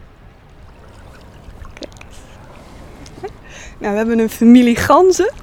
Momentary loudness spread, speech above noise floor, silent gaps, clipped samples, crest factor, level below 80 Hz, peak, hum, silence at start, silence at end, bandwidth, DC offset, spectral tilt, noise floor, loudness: 25 LU; 29 dB; none; under 0.1%; 16 dB; -40 dBFS; 0 dBFS; none; 1.65 s; 0 s; 16.5 kHz; under 0.1%; -5 dB/octave; -42 dBFS; -12 LUFS